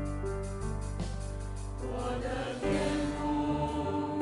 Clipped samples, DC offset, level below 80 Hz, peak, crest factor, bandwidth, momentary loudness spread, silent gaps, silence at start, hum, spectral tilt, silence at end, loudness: under 0.1%; under 0.1%; -40 dBFS; -18 dBFS; 14 dB; 11.5 kHz; 8 LU; none; 0 s; none; -6.5 dB/octave; 0 s; -34 LUFS